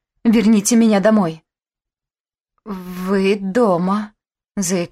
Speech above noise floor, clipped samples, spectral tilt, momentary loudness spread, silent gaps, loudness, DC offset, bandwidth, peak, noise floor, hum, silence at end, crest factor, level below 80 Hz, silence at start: over 74 dB; under 0.1%; -5.5 dB/octave; 17 LU; 2.20-2.24 s; -16 LUFS; under 0.1%; 15 kHz; -4 dBFS; under -90 dBFS; none; 0.05 s; 14 dB; -52 dBFS; 0.25 s